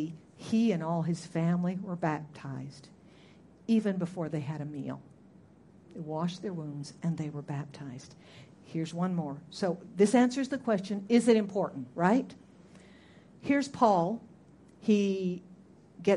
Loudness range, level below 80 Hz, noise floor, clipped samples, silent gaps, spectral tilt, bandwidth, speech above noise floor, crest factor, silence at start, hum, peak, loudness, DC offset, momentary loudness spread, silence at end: 10 LU; -72 dBFS; -57 dBFS; under 0.1%; none; -7 dB/octave; 11.5 kHz; 27 dB; 20 dB; 0 s; none; -10 dBFS; -31 LUFS; under 0.1%; 17 LU; 0 s